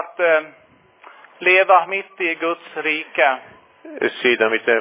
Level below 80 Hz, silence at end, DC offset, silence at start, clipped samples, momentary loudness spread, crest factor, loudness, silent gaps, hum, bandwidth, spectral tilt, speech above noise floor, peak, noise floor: -76 dBFS; 0 s; under 0.1%; 0 s; under 0.1%; 10 LU; 18 dB; -18 LUFS; none; none; 4 kHz; -6.5 dB/octave; 29 dB; -2 dBFS; -47 dBFS